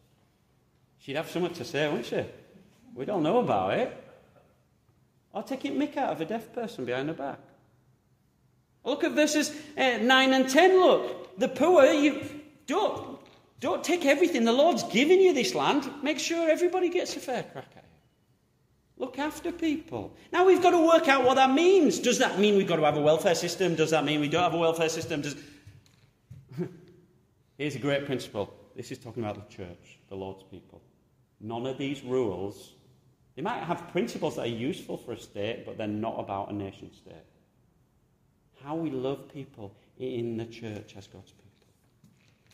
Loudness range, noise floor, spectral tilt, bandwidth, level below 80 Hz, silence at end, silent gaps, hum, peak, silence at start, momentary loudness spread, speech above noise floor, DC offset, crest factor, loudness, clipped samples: 15 LU; -68 dBFS; -4.5 dB/octave; 15.5 kHz; -68 dBFS; 1.3 s; none; none; -6 dBFS; 1.05 s; 20 LU; 41 dB; under 0.1%; 22 dB; -26 LUFS; under 0.1%